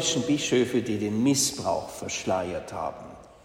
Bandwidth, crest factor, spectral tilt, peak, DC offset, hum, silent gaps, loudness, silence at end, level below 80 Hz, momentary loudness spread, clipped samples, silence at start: 16 kHz; 16 dB; -3.5 dB/octave; -12 dBFS; under 0.1%; none; none; -26 LUFS; 0.1 s; -58 dBFS; 11 LU; under 0.1%; 0 s